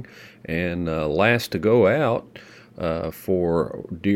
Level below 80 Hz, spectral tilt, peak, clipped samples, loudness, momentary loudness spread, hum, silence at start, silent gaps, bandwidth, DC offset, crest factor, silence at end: -48 dBFS; -6.5 dB/octave; -2 dBFS; under 0.1%; -22 LUFS; 11 LU; none; 0 s; none; 17 kHz; under 0.1%; 20 dB; 0 s